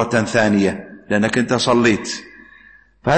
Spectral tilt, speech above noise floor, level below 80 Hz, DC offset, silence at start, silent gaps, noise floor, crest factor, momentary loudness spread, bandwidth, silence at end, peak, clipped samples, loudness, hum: -5 dB/octave; 31 dB; -48 dBFS; under 0.1%; 0 s; none; -48 dBFS; 16 dB; 12 LU; 8.8 kHz; 0 s; -4 dBFS; under 0.1%; -17 LUFS; none